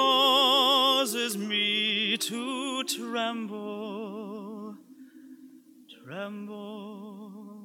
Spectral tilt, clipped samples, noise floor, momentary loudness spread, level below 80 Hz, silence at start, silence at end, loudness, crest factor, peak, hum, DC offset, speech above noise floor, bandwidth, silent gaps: -2 dB/octave; under 0.1%; -53 dBFS; 22 LU; under -90 dBFS; 0 s; 0 s; -25 LUFS; 18 dB; -10 dBFS; none; under 0.1%; 18 dB; 17.5 kHz; none